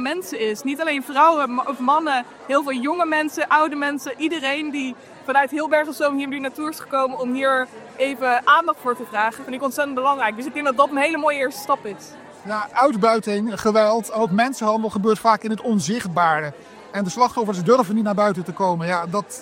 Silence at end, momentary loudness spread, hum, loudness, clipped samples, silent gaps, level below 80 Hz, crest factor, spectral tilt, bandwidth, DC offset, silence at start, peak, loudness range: 0 s; 9 LU; none; -20 LUFS; under 0.1%; none; -66 dBFS; 18 dB; -4.5 dB/octave; 16.5 kHz; under 0.1%; 0 s; -2 dBFS; 2 LU